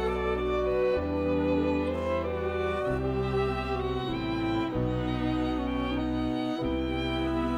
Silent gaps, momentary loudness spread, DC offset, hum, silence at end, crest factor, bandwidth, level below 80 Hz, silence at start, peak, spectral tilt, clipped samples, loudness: none; 3 LU; under 0.1%; none; 0 s; 14 dB; 10.5 kHz; -40 dBFS; 0 s; -16 dBFS; -7.5 dB/octave; under 0.1%; -29 LUFS